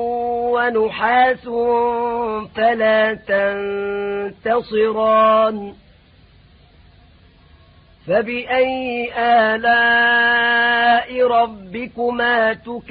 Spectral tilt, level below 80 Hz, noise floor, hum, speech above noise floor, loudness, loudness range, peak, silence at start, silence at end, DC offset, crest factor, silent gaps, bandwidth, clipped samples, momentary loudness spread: -9 dB/octave; -52 dBFS; -49 dBFS; none; 32 dB; -17 LUFS; 8 LU; -4 dBFS; 0 s; 0.1 s; under 0.1%; 14 dB; none; 4.9 kHz; under 0.1%; 10 LU